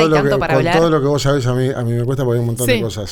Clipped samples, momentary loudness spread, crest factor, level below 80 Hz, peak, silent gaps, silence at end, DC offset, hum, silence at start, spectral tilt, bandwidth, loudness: under 0.1%; 5 LU; 14 dB; -36 dBFS; -2 dBFS; none; 0 s; under 0.1%; none; 0 s; -6 dB/octave; 18.5 kHz; -16 LUFS